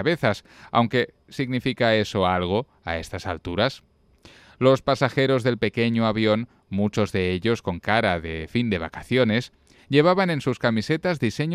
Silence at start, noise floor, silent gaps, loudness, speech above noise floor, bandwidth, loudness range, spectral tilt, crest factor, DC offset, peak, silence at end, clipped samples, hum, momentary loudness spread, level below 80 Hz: 0 s; -52 dBFS; none; -23 LUFS; 30 dB; 14 kHz; 2 LU; -6.5 dB/octave; 18 dB; under 0.1%; -4 dBFS; 0 s; under 0.1%; none; 9 LU; -50 dBFS